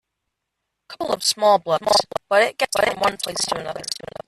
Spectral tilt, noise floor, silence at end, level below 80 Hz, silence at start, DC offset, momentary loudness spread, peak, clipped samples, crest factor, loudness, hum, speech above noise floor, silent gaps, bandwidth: -1.5 dB/octave; -79 dBFS; 0.35 s; -58 dBFS; 0.9 s; under 0.1%; 10 LU; -4 dBFS; under 0.1%; 18 dB; -20 LUFS; none; 58 dB; none; 14 kHz